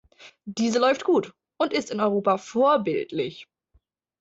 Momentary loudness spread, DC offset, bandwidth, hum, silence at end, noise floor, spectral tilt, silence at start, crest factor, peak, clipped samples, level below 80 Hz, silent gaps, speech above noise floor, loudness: 15 LU; under 0.1%; 8 kHz; none; 0.8 s; -66 dBFS; -5 dB/octave; 0.2 s; 18 dB; -8 dBFS; under 0.1%; -68 dBFS; none; 43 dB; -24 LUFS